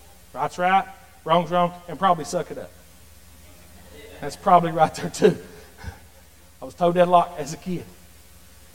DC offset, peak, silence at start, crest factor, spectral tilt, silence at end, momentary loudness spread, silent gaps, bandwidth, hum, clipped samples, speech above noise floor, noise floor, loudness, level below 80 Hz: 0.5%; -2 dBFS; 0.35 s; 22 dB; -5.5 dB/octave; 0.85 s; 23 LU; none; 17 kHz; none; under 0.1%; 30 dB; -51 dBFS; -22 LUFS; -52 dBFS